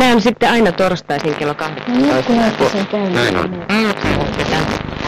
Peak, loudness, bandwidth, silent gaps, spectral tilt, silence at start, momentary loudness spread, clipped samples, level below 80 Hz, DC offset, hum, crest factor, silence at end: -6 dBFS; -15 LUFS; 15.5 kHz; none; -5.5 dB/octave; 0 s; 7 LU; under 0.1%; -36 dBFS; under 0.1%; none; 10 dB; 0 s